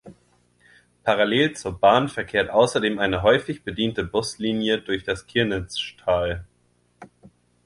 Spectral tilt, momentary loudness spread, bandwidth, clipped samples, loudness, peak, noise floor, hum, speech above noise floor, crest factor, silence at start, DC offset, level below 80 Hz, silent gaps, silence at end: -5 dB/octave; 9 LU; 11.5 kHz; under 0.1%; -22 LUFS; -2 dBFS; -64 dBFS; 60 Hz at -50 dBFS; 42 dB; 20 dB; 0.05 s; under 0.1%; -46 dBFS; none; 0.6 s